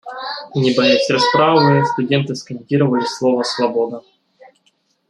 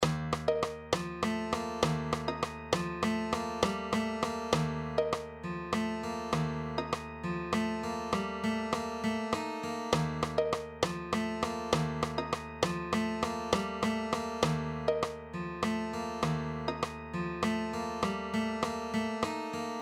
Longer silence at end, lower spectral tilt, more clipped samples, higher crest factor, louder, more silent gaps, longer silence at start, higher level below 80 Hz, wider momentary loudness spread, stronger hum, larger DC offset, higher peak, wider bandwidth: first, 1.1 s vs 0 s; about the same, -5.5 dB/octave vs -5 dB/octave; neither; second, 16 dB vs 22 dB; first, -16 LUFS vs -34 LUFS; neither; about the same, 0.05 s vs 0 s; second, -60 dBFS vs -54 dBFS; first, 12 LU vs 5 LU; neither; neither; first, -2 dBFS vs -10 dBFS; second, 11 kHz vs 15.5 kHz